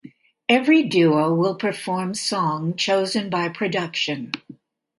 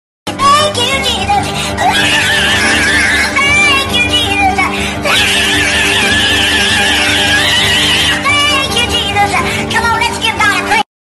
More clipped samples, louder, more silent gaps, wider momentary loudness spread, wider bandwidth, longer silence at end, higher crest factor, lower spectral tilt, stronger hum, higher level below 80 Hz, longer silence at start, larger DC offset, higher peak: neither; second, -21 LUFS vs -9 LUFS; neither; first, 9 LU vs 5 LU; second, 11.5 kHz vs 13 kHz; first, 0.45 s vs 0.2 s; first, 18 dB vs 10 dB; first, -5 dB/octave vs -2 dB/octave; neither; second, -68 dBFS vs -30 dBFS; second, 0.05 s vs 0.25 s; neither; about the same, -2 dBFS vs 0 dBFS